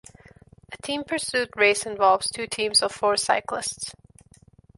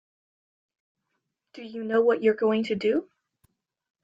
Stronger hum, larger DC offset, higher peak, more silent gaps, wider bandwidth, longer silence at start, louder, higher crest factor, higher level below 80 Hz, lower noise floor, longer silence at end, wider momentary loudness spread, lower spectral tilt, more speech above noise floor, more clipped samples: neither; neither; first, -6 dBFS vs -10 dBFS; neither; first, 12 kHz vs 7.6 kHz; second, 0.7 s vs 1.55 s; about the same, -23 LUFS vs -24 LUFS; about the same, 20 dB vs 18 dB; first, -60 dBFS vs -74 dBFS; second, -54 dBFS vs -80 dBFS; second, 0.85 s vs 1 s; about the same, 13 LU vs 15 LU; second, -1 dB/octave vs -7 dB/octave; second, 31 dB vs 56 dB; neither